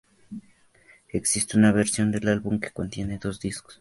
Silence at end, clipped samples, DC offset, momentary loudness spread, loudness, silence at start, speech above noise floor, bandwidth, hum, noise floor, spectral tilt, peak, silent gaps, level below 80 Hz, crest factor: 0.05 s; under 0.1%; under 0.1%; 23 LU; -25 LUFS; 0.3 s; 33 dB; 11.5 kHz; none; -58 dBFS; -4.5 dB/octave; -6 dBFS; none; -50 dBFS; 20 dB